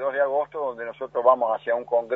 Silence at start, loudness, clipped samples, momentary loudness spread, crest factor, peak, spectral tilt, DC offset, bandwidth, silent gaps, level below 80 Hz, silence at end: 0 s; -24 LUFS; under 0.1%; 10 LU; 20 dB; -4 dBFS; -7 dB/octave; under 0.1%; 4 kHz; none; -70 dBFS; 0 s